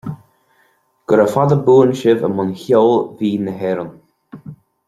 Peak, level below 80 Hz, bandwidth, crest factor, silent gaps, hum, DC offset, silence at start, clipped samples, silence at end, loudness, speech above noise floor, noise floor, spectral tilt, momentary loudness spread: -2 dBFS; -58 dBFS; 13 kHz; 16 dB; none; none; under 0.1%; 0.05 s; under 0.1%; 0.35 s; -15 LUFS; 45 dB; -59 dBFS; -8 dB/octave; 22 LU